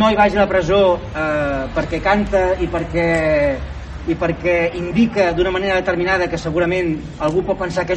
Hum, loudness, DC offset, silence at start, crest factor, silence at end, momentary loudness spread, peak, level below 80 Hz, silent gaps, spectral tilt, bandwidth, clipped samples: none; -18 LUFS; under 0.1%; 0 s; 16 dB; 0 s; 7 LU; 0 dBFS; -32 dBFS; none; -6.5 dB/octave; 8.8 kHz; under 0.1%